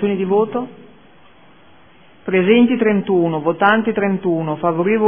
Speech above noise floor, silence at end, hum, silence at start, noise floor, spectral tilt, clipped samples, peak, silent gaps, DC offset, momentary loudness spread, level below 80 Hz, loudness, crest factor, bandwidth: 33 dB; 0 s; none; 0 s; -48 dBFS; -10.5 dB/octave; under 0.1%; 0 dBFS; none; 0.4%; 8 LU; -60 dBFS; -16 LUFS; 18 dB; 3.6 kHz